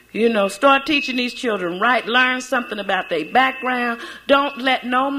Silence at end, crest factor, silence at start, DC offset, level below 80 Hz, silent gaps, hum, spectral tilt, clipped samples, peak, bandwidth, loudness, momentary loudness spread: 0 s; 16 dB; 0.15 s; under 0.1%; -58 dBFS; none; none; -3.5 dB/octave; under 0.1%; -2 dBFS; 16 kHz; -18 LUFS; 7 LU